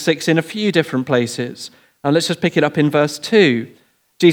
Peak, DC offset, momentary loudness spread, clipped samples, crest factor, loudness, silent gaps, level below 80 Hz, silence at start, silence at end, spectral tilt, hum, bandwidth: 0 dBFS; under 0.1%; 12 LU; under 0.1%; 16 dB; -17 LUFS; none; -68 dBFS; 0 s; 0 s; -5.5 dB/octave; none; 18.5 kHz